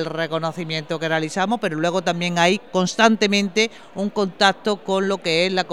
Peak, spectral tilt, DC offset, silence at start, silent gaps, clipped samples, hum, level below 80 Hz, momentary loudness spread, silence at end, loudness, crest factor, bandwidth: 0 dBFS; -4 dB/octave; 0.4%; 0 s; none; under 0.1%; none; -66 dBFS; 8 LU; 0 s; -20 LUFS; 20 dB; 13 kHz